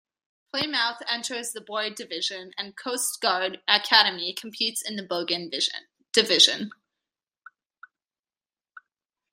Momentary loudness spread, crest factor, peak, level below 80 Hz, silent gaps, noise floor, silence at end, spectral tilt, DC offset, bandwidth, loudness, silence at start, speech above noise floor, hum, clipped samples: 15 LU; 26 dB; 0 dBFS; -80 dBFS; 8.19-8.23 s; under -90 dBFS; 0.55 s; -0.5 dB/octave; under 0.1%; 16 kHz; -24 LUFS; 0.55 s; over 64 dB; none; under 0.1%